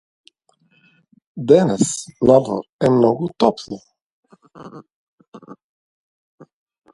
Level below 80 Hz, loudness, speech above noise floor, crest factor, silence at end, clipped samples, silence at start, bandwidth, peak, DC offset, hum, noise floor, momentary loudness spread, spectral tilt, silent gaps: -56 dBFS; -17 LUFS; 44 dB; 20 dB; 1.4 s; under 0.1%; 1.35 s; 11.5 kHz; 0 dBFS; under 0.1%; none; -61 dBFS; 24 LU; -6 dB/octave; 2.69-2.79 s, 4.02-4.23 s, 4.92-5.18 s, 5.28-5.32 s